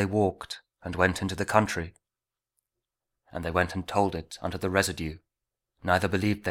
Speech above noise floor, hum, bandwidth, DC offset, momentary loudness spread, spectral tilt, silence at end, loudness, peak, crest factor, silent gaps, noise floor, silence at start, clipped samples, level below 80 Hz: over 62 dB; none; 17.5 kHz; under 0.1%; 14 LU; -5 dB/octave; 0 s; -28 LUFS; -4 dBFS; 24 dB; none; under -90 dBFS; 0 s; under 0.1%; -50 dBFS